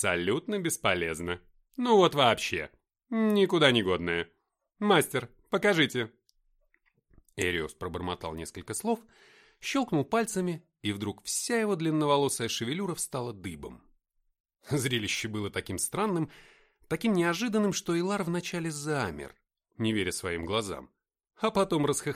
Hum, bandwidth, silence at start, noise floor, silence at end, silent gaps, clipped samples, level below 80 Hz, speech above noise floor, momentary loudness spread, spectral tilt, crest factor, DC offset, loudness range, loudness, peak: none; 16 kHz; 0 s; -71 dBFS; 0 s; 14.40-14.44 s; under 0.1%; -60 dBFS; 43 dB; 13 LU; -4 dB/octave; 24 dB; under 0.1%; 7 LU; -29 LUFS; -6 dBFS